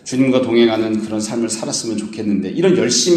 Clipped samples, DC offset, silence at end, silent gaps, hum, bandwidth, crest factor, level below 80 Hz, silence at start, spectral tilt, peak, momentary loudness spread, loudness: under 0.1%; under 0.1%; 0 s; none; none; 13 kHz; 14 dB; -58 dBFS; 0.05 s; -4 dB/octave; -2 dBFS; 7 LU; -17 LUFS